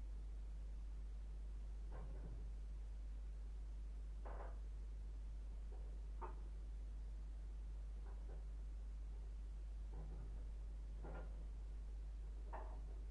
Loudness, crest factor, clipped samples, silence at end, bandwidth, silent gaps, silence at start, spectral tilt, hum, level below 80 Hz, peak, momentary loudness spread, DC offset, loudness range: -54 LUFS; 12 dB; under 0.1%; 0 s; 6.8 kHz; none; 0 s; -7.5 dB/octave; none; -50 dBFS; -36 dBFS; 1 LU; under 0.1%; 0 LU